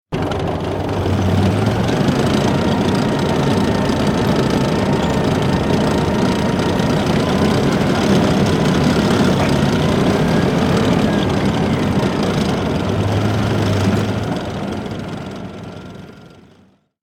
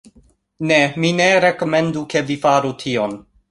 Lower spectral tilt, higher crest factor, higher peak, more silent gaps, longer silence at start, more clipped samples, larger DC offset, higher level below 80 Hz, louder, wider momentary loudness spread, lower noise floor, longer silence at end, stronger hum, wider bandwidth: first, -6.5 dB/octave vs -5 dB/octave; about the same, 14 dB vs 16 dB; about the same, -2 dBFS vs -2 dBFS; neither; second, 0.1 s vs 0.6 s; neither; neither; first, -36 dBFS vs -56 dBFS; about the same, -16 LUFS vs -17 LUFS; about the same, 8 LU vs 9 LU; about the same, -52 dBFS vs -54 dBFS; first, 0.75 s vs 0.3 s; neither; first, 16.5 kHz vs 11.5 kHz